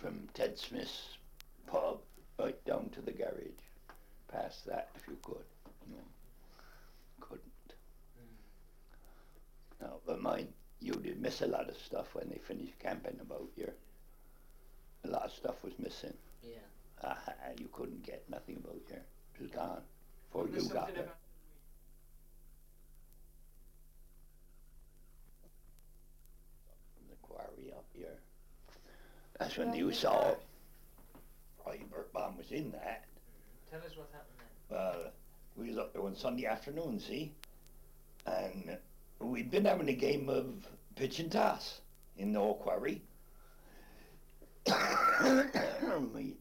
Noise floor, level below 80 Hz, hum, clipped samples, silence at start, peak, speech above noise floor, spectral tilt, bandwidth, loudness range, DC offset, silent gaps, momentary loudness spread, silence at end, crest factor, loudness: -59 dBFS; -58 dBFS; none; under 0.1%; 0 s; -18 dBFS; 20 dB; -5 dB/octave; 16.5 kHz; 19 LU; under 0.1%; none; 24 LU; 0 s; 24 dB; -39 LUFS